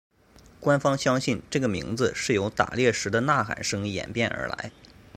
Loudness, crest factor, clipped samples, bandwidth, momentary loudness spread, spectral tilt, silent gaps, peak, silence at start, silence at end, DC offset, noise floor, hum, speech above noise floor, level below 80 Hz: -26 LUFS; 22 dB; under 0.1%; 15.5 kHz; 7 LU; -4.5 dB/octave; none; -4 dBFS; 0.6 s; 0.3 s; under 0.1%; -54 dBFS; none; 29 dB; -54 dBFS